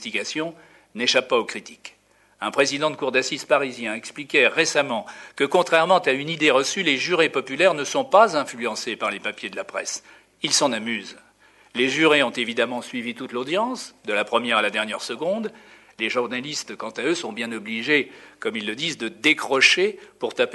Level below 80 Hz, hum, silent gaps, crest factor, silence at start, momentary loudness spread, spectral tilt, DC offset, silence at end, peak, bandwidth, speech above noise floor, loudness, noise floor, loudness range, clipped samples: -72 dBFS; none; none; 22 dB; 0 s; 13 LU; -2.5 dB/octave; under 0.1%; 0 s; -2 dBFS; 12 kHz; 33 dB; -22 LUFS; -55 dBFS; 6 LU; under 0.1%